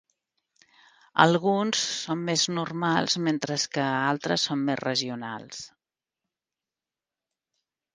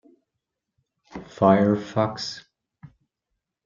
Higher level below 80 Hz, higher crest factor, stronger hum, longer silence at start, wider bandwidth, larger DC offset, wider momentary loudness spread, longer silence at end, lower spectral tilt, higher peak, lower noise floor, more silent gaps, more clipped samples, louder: second, -72 dBFS vs -66 dBFS; first, 28 dB vs 22 dB; neither; about the same, 1.15 s vs 1.15 s; first, 10 kHz vs 7.6 kHz; neither; second, 14 LU vs 23 LU; first, 2.3 s vs 1.25 s; second, -3.5 dB/octave vs -6.5 dB/octave; first, 0 dBFS vs -4 dBFS; first, under -90 dBFS vs -83 dBFS; neither; neither; second, -25 LUFS vs -22 LUFS